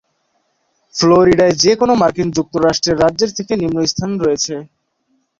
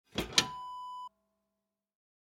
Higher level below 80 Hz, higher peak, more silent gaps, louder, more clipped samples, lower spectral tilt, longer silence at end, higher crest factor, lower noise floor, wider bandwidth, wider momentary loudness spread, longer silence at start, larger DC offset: first, -44 dBFS vs -60 dBFS; first, 0 dBFS vs -8 dBFS; neither; first, -14 LUFS vs -32 LUFS; neither; first, -4.5 dB/octave vs -1.5 dB/octave; second, 0.75 s vs 1.2 s; second, 16 dB vs 32 dB; second, -64 dBFS vs -87 dBFS; second, 7.6 kHz vs over 20 kHz; second, 8 LU vs 18 LU; first, 0.95 s vs 0.15 s; neither